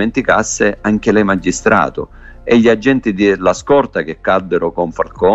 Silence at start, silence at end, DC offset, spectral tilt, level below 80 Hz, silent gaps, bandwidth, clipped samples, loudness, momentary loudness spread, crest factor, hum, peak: 0 s; 0 s; under 0.1%; -5 dB/octave; -38 dBFS; none; 8.2 kHz; under 0.1%; -14 LUFS; 8 LU; 14 dB; none; 0 dBFS